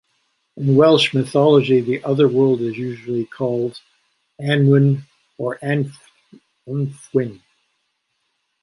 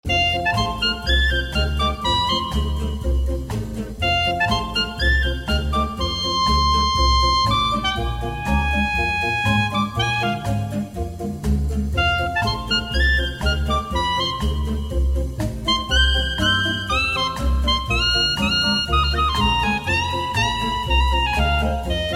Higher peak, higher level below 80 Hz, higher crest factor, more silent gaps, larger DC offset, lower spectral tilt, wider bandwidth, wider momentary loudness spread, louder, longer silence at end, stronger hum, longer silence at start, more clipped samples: first, -2 dBFS vs -6 dBFS; second, -64 dBFS vs -26 dBFS; about the same, 18 dB vs 16 dB; neither; second, under 0.1% vs 0.1%; first, -7 dB/octave vs -4.5 dB/octave; second, 11.5 kHz vs 15 kHz; first, 14 LU vs 7 LU; about the same, -18 LUFS vs -20 LUFS; first, 1.25 s vs 0 s; neither; first, 0.55 s vs 0.05 s; neither